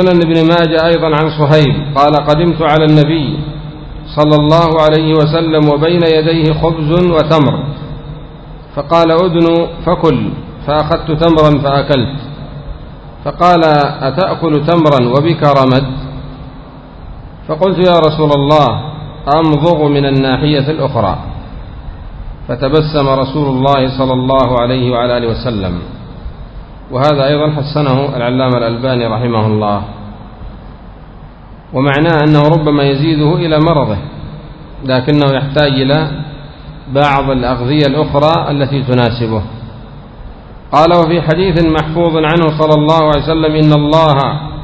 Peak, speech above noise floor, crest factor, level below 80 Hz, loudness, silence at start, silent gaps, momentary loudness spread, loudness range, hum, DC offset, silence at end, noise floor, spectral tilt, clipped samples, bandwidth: 0 dBFS; 22 dB; 12 dB; -30 dBFS; -11 LUFS; 0 s; none; 20 LU; 4 LU; none; under 0.1%; 0 s; -32 dBFS; -8.5 dB/octave; 0.5%; 8 kHz